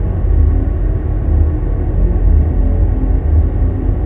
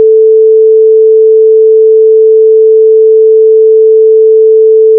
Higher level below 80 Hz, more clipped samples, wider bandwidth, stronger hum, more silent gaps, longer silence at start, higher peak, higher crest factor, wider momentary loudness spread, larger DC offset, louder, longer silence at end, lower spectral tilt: first, -14 dBFS vs under -90 dBFS; second, under 0.1% vs 0.7%; first, 2.4 kHz vs 0.5 kHz; neither; neither; about the same, 0 s vs 0 s; about the same, -2 dBFS vs 0 dBFS; first, 10 dB vs 4 dB; first, 4 LU vs 0 LU; neither; second, -15 LUFS vs -4 LUFS; about the same, 0 s vs 0 s; first, -12.5 dB/octave vs -11 dB/octave